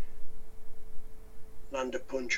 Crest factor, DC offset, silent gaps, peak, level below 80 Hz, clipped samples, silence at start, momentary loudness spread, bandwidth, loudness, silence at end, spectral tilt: 10 dB; under 0.1%; none; -18 dBFS; -46 dBFS; under 0.1%; 0 s; 21 LU; 7.6 kHz; -38 LUFS; 0 s; -3.5 dB/octave